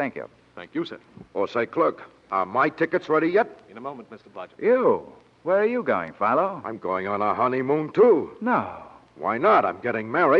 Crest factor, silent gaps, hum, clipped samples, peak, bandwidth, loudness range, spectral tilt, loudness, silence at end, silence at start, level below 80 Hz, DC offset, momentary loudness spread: 16 dB; none; none; under 0.1%; -6 dBFS; 6.6 kHz; 3 LU; -8 dB/octave; -23 LUFS; 0 s; 0 s; -68 dBFS; under 0.1%; 19 LU